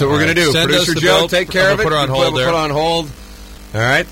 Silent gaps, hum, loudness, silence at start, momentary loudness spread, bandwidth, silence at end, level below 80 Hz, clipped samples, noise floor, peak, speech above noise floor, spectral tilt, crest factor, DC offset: none; none; -14 LUFS; 0 s; 6 LU; 16.5 kHz; 0 s; -36 dBFS; under 0.1%; -34 dBFS; -2 dBFS; 20 dB; -4 dB/octave; 14 dB; under 0.1%